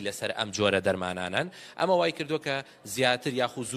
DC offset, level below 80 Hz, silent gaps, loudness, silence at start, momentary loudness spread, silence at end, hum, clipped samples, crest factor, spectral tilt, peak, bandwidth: under 0.1%; -66 dBFS; none; -28 LUFS; 0 s; 7 LU; 0 s; none; under 0.1%; 20 dB; -4 dB/octave; -8 dBFS; 15.5 kHz